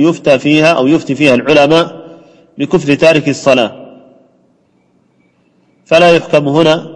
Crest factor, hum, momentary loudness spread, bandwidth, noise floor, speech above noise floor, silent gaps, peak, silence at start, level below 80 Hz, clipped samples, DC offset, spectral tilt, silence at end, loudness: 12 dB; none; 6 LU; 10.5 kHz; -54 dBFS; 45 dB; none; 0 dBFS; 0 s; -48 dBFS; 0.4%; under 0.1%; -5.5 dB/octave; 0 s; -10 LUFS